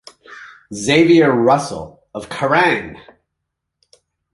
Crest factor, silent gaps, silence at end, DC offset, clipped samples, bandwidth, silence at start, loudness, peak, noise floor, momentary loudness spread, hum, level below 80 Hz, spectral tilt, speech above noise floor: 18 dB; none; 1.35 s; under 0.1%; under 0.1%; 11.5 kHz; 0.3 s; -14 LUFS; 0 dBFS; -77 dBFS; 21 LU; none; -52 dBFS; -5 dB/octave; 62 dB